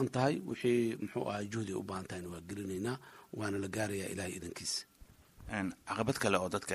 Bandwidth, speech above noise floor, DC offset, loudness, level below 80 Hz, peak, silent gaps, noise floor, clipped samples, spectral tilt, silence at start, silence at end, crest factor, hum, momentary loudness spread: 15 kHz; 23 dB; under 0.1%; -37 LUFS; -64 dBFS; -14 dBFS; none; -60 dBFS; under 0.1%; -5 dB/octave; 0 s; 0 s; 24 dB; none; 12 LU